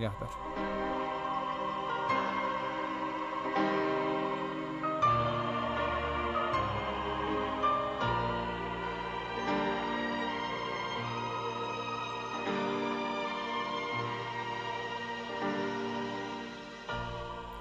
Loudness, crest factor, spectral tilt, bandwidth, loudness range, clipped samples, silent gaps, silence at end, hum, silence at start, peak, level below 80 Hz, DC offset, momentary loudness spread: -34 LUFS; 16 dB; -5.5 dB/octave; 10.5 kHz; 4 LU; under 0.1%; none; 0 s; none; 0 s; -18 dBFS; -54 dBFS; under 0.1%; 7 LU